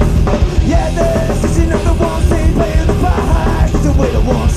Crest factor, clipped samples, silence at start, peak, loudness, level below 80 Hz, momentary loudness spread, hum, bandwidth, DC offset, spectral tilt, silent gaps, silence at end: 12 dB; under 0.1%; 0 s; 0 dBFS; -13 LUFS; -14 dBFS; 1 LU; none; 14 kHz; 1%; -7 dB/octave; none; 0 s